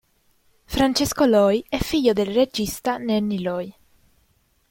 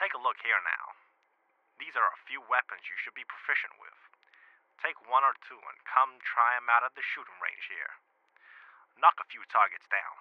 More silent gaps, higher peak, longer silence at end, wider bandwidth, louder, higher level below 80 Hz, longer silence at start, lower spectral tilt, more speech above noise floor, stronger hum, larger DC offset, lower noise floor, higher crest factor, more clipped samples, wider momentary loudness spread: neither; first, -4 dBFS vs -8 dBFS; first, 1 s vs 0.05 s; first, 17 kHz vs 6 kHz; first, -21 LUFS vs -30 LUFS; first, -44 dBFS vs under -90 dBFS; first, 0.7 s vs 0 s; first, -4.5 dB/octave vs -1.5 dB/octave; about the same, 43 dB vs 42 dB; neither; neither; second, -64 dBFS vs -73 dBFS; second, 18 dB vs 24 dB; neither; second, 10 LU vs 16 LU